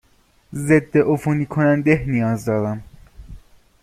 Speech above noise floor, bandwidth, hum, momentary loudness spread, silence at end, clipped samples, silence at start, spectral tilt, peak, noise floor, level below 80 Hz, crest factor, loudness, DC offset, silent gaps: 39 dB; 14.5 kHz; none; 11 LU; 0.45 s; under 0.1%; 0.5 s; -8 dB/octave; -2 dBFS; -57 dBFS; -44 dBFS; 18 dB; -19 LUFS; under 0.1%; none